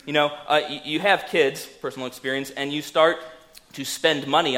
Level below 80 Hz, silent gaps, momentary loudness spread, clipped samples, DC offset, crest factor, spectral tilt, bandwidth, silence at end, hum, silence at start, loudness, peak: -66 dBFS; none; 13 LU; under 0.1%; under 0.1%; 20 dB; -3.5 dB/octave; 16.5 kHz; 0 s; none; 0.05 s; -23 LUFS; -2 dBFS